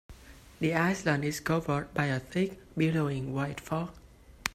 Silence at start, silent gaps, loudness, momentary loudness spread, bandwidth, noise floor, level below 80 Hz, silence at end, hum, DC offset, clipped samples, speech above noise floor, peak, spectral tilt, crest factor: 0.1 s; none; -31 LUFS; 7 LU; 15.5 kHz; -51 dBFS; -56 dBFS; 0 s; none; under 0.1%; under 0.1%; 21 dB; -6 dBFS; -6 dB/octave; 24 dB